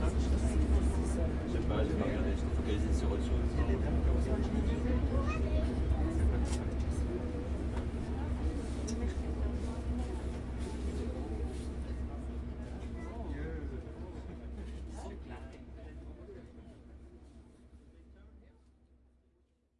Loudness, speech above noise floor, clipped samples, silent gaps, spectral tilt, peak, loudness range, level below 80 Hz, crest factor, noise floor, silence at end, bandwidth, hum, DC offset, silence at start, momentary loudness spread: -36 LUFS; 41 dB; under 0.1%; none; -7.5 dB/octave; -18 dBFS; 16 LU; -36 dBFS; 16 dB; -72 dBFS; 1.4 s; 11 kHz; none; under 0.1%; 0 s; 17 LU